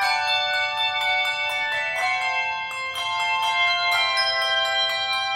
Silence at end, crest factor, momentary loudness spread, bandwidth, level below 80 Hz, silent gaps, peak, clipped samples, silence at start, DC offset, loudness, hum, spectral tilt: 0 s; 14 dB; 5 LU; 16 kHz; -66 dBFS; none; -10 dBFS; under 0.1%; 0 s; under 0.1%; -21 LUFS; none; 1 dB/octave